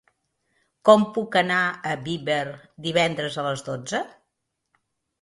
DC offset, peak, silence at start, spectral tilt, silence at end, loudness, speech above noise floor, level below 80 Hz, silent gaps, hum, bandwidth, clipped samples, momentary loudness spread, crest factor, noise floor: under 0.1%; 0 dBFS; 0.85 s; -4.5 dB/octave; 1.15 s; -23 LUFS; 56 dB; -66 dBFS; none; none; 11.5 kHz; under 0.1%; 13 LU; 24 dB; -79 dBFS